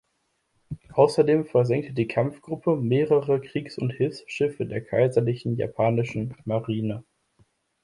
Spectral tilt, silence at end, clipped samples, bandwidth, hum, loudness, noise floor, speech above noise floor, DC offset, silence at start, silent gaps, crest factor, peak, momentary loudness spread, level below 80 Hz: -8 dB/octave; 0.8 s; under 0.1%; 11.5 kHz; none; -25 LUFS; -73 dBFS; 50 dB; under 0.1%; 0.7 s; none; 20 dB; -6 dBFS; 10 LU; -60 dBFS